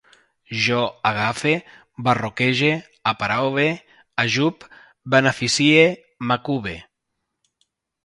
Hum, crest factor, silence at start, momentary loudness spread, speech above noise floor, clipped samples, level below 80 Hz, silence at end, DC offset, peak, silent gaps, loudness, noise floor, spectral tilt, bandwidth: none; 22 dB; 0.5 s; 13 LU; 58 dB; under 0.1%; -56 dBFS; 1.25 s; under 0.1%; 0 dBFS; none; -20 LUFS; -78 dBFS; -4.5 dB/octave; 11.5 kHz